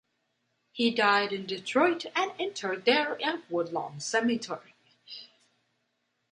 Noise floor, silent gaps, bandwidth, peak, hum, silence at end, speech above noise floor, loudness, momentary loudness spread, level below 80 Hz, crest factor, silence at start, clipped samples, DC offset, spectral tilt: -78 dBFS; none; 10.5 kHz; -10 dBFS; none; 1.05 s; 49 dB; -28 LUFS; 18 LU; -80 dBFS; 22 dB; 0.75 s; under 0.1%; under 0.1%; -3.5 dB/octave